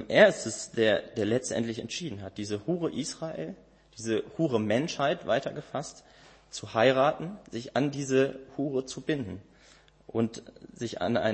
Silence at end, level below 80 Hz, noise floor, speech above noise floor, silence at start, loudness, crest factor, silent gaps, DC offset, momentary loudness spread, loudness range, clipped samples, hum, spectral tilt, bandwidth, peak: 0 s; -64 dBFS; -58 dBFS; 29 dB; 0 s; -29 LUFS; 24 dB; none; under 0.1%; 15 LU; 4 LU; under 0.1%; none; -5 dB/octave; 8.8 kHz; -6 dBFS